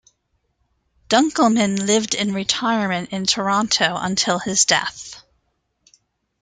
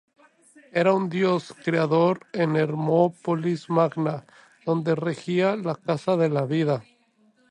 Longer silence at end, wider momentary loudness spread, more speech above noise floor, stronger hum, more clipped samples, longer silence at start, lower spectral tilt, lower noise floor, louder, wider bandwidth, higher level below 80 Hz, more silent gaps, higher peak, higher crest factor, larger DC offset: first, 1.25 s vs 0.7 s; about the same, 6 LU vs 7 LU; first, 50 dB vs 39 dB; neither; neither; first, 1.1 s vs 0.75 s; second, -2.5 dB/octave vs -7.5 dB/octave; first, -70 dBFS vs -63 dBFS; first, -18 LUFS vs -24 LUFS; about the same, 9.6 kHz vs 10.5 kHz; first, -58 dBFS vs -72 dBFS; neither; first, -2 dBFS vs -6 dBFS; about the same, 20 dB vs 18 dB; neither